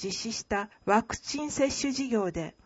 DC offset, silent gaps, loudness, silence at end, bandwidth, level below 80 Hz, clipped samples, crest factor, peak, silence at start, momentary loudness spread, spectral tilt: under 0.1%; none; -30 LUFS; 0.15 s; 8 kHz; -54 dBFS; under 0.1%; 20 dB; -10 dBFS; 0 s; 6 LU; -3.5 dB/octave